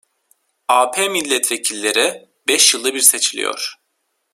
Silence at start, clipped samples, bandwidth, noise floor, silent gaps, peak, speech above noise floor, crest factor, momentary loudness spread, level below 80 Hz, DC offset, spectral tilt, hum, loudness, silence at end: 0.7 s; under 0.1%; 16.5 kHz; -70 dBFS; none; 0 dBFS; 53 dB; 18 dB; 12 LU; -70 dBFS; under 0.1%; 1 dB/octave; none; -15 LUFS; 0.6 s